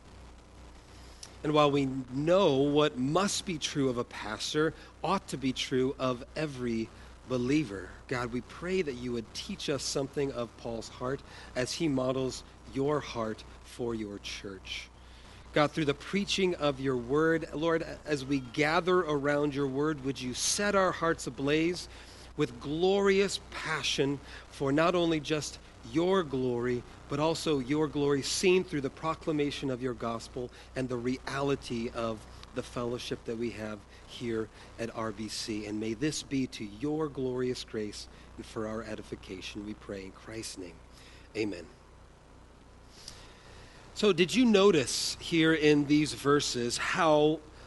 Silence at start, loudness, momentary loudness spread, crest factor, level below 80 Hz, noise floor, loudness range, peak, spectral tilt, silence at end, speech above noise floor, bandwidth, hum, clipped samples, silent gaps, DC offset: 0.05 s; -31 LUFS; 15 LU; 22 dB; -54 dBFS; -55 dBFS; 9 LU; -10 dBFS; -4.5 dB/octave; 0 s; 24 dB; 11.5 kHz; none; under 0.1%; none; under 0.1%